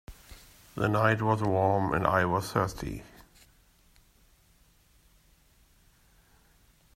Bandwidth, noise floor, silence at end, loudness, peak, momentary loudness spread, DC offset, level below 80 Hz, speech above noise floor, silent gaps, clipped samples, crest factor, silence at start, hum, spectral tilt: 16 kHz; -63 dBFS; 3.9 s; -28 LUFS; -8 dBFS; 21 LU; under 0.1%; -54 dBFS; 36 dB; none; under 0.1%; 22 dB; 0.1 s; none; -6.5 dB/octave